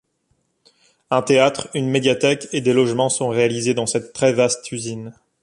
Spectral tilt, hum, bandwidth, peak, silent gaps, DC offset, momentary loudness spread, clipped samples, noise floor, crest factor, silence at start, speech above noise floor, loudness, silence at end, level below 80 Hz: -4.5 dB/octave; none; 11.5 kHz; -2 dBFS; none; under 0.1%; 11 LU; under 0.1%; -67 dBFS; 18 dB; 1.1 s; 49 dB; -19 LUFS; 0.3 s; -60 dBFS